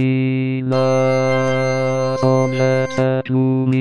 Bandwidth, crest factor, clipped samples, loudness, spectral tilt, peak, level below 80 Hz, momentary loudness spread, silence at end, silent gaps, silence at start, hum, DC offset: 10 kHz; 12 dB; under 0.1%; -17 LUFS; -7 dB/octave; -4 dBFS; -54 dBFS; 3 LU; 0 s; none; 0 s; none; under 0.1%